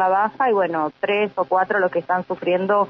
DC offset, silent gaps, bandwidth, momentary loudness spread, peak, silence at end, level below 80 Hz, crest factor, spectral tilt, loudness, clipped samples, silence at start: under 0.1%; none; 5.8 kHz; 4 LU; -6 dBFS; 0 s; -68 dBFS; 12 dB; -8 dB/octave; -21 LUFS; under 0.1%; 0 s